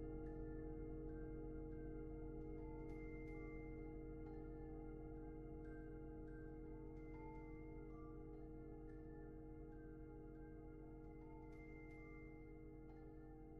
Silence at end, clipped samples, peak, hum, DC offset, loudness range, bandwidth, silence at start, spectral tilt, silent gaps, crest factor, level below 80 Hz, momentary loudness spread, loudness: 0 s; under 0.1%; -40 dBFS; none; under 0.1%; 5 LU; 3 kHz; 0 s; -10 dB/octave; none; 14 dB; -58 dBFS; 6 LU; -56 LUFS